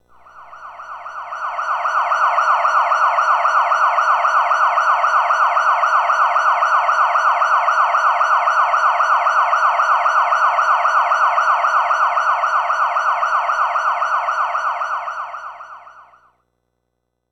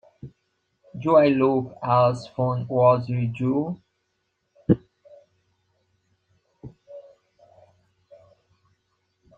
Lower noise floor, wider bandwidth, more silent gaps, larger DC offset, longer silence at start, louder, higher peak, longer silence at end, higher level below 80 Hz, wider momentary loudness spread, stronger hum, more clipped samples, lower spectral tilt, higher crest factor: about the same, -73 dBFS vs -75 dBFS; first, 10.5 kHz vs 8.4 kHz; neither; neither; about the same, 0.35 s vs 0.25 s; first, -15 LUFS vs -22 LUFS; about the same, -4 dBFS vs -4 dBFS; second, 1.3 s vs 2.35 s; second, -66 dBFS vs -60 dBFS; second, 9 LU vs 15 LU; first, 60 Hz at -65 dBFS vs none; neither; second, 1 dB/octave vs -9 dB/octave; second, 12 dB vs 22 dB